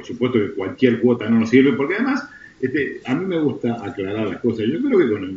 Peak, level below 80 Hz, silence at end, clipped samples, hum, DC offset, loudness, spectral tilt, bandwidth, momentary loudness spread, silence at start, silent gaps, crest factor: 0 dBFS; -60 dBFS; 0 s; under 0.1%; none; under 0.1%; -20 LUFS; -5.5 dB/octave; 7.4 kHz; 10 LU; 0 s; none; 18 dB